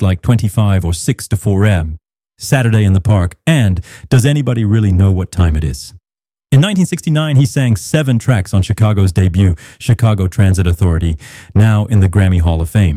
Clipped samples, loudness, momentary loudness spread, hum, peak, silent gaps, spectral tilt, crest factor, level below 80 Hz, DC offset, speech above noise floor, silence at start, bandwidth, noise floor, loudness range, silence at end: under 0.1%; -13 LUFS; 6 LU; none; -2 dBFS; none; -6.5 dB/octave; 12 dB; -28 dBFS; under 0.1%; over 78 dB; 0 s; 14.5 kHz; under -90 dBFS; 1 LU; 0 s